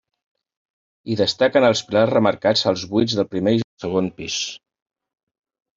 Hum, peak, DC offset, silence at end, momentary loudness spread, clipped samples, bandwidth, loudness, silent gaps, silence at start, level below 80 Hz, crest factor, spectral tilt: none; -2 dBFS; under 0.1%; 1.2 s; 8 LU; under 0.1%; 7.8 kHz; -20 LUFS; 3.64-3.77 s; 1.05 s; -58 dBFS; 18 dB; -4.5 dB/octave